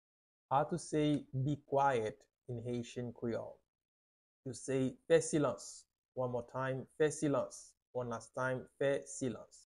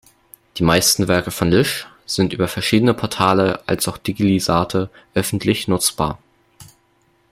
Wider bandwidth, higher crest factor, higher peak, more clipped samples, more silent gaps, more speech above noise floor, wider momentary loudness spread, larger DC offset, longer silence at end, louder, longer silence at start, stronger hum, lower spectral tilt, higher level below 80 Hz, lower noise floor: second, 12 kHz vs 16.5 kHz; about the same, 20 dB vs 18 dB; second, -18 dBFS vs -2 dBFS; neither; first, 3.68-3.74 s, 3.85-4.43 s, 5.98-6.12 s, 7.82-7.94 s vs none; first, over 53 dB vs 42 dB; first, 16 LU vs 9 LU; neither; second, 0.15 s vs 0.7 s; second, -37 LUFS vs -18 LUFS; about the same, 0.5 s vs 0.55 s; neither; about the same, -5.5 dB/octave vs -4.5 dB/octave; second, -70 dBFS vs -46 dBFS; first, under -90 dBFS vs -60 dBFS